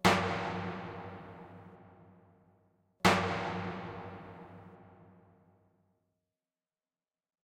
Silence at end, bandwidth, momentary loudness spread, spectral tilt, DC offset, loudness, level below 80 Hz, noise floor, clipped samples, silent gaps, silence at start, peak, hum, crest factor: 2.4 s; 15.5 kHz; 25 LU; -4.5 dB/octave; under 0.1%; -33 LUFS; -62 dBFS; under -90 dBFS; under 0.1%; none; 0.05 s; -10 dBFS; none; 28 dB